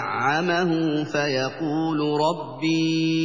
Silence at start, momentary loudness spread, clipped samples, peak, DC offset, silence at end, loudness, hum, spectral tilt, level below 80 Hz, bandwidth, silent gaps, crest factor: 0 s; 4 LU; under 0.1%; -10 dBFS; 0.2%; 0 s; -23 LUFS; none; -5.5 dB/octave; -68 dBFS; 7.6 kHz; none; 14 dB